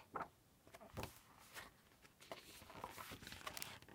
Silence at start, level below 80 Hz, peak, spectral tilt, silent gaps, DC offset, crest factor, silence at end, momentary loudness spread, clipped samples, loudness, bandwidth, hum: 0 s; -72 dBFS; -20 dBFS; -3 dB/octave; none; under 0.1%; 36 dB; 0 s; 13 LU; under 0.1%; -54 LUFS; 17.5 kHz; none